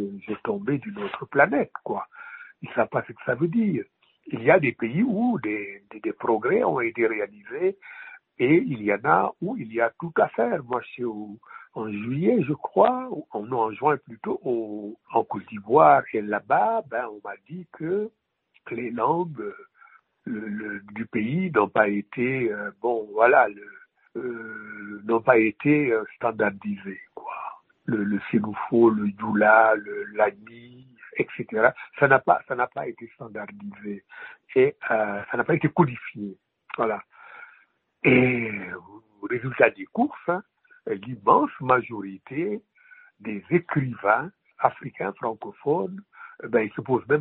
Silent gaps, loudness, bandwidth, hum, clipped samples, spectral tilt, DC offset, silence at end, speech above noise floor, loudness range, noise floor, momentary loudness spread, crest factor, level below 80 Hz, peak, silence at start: none; -24 LUFS; 4.1 kHz; none; under 0.1%; -6 dB/octave; under 0.1%; 0 s; 37 dB; 5 LU; -61 dBFS; 18 LU; 24 dB; -66 dBFS; -2 dBFS; 0 s